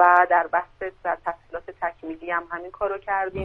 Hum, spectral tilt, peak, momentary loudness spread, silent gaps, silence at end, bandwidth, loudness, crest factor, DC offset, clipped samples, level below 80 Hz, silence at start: none; -7.5 dB/octave; -4 dBFS; 16 LU; none; 0 s; 4.3 kHz; -25 LUFS; 20 dB; under 0.1%; under 0.1%; -52 dBFS; 0 s